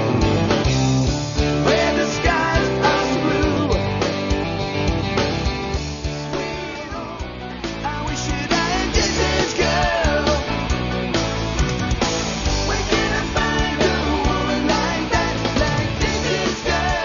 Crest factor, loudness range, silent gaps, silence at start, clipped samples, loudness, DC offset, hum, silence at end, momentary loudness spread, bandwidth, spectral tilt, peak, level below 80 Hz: 16 dB; 6 LU; none; 0 s; under 0.1%; -20 LUFS; under 0.1%; none; 0 s; 8 LU; 7.4 kHz; -4.5 dB/octave; -4 dBFS; -28 dBFS